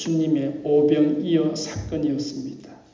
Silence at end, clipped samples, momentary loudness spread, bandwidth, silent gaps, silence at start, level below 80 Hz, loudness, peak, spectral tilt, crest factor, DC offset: 0.2 s; under 0.1%; 13 LU; 7.6 kHz; none; 0 s; -50 dBFS; -22 LUFS; -6 dBFS; -6.5 dB/octave; 16 dB; under 0.1%